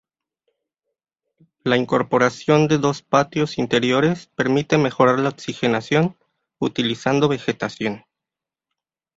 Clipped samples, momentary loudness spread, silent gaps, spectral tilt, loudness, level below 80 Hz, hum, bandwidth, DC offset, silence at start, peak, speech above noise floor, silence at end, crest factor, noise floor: under 0.1%; 8 LU; none; -6 dB/octave; -20 LUFS; -58 dBFS; none; 8 kHz; under 0.1%; 1.65 s; -2 dBFS; 68 dB; 1.2 s; 20 dB; -87 dBFS